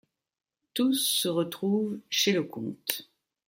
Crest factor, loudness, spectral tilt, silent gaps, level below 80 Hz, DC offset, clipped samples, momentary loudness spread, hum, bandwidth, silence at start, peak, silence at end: 24 dB; -28 LUFS; -3.5 dB/octave; none; -76 dBFS; under 0.1%; under 0.1%; 10 LU; none; 16.5 kHz; 0.75 s; -6 dBFS; 0.45 s